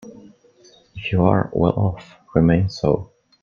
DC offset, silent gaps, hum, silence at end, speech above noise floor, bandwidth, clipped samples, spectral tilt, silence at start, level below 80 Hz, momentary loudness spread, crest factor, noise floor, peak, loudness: under 0.1%; none; none; 0.35 s; 34 dB; 7 kHz; under 0.1%; -8.5 dB/octave; 0.05 s; -44 dBFS; 12 LU; 20 dB; -52 dBFS; 0 dBFS; -20 LUFS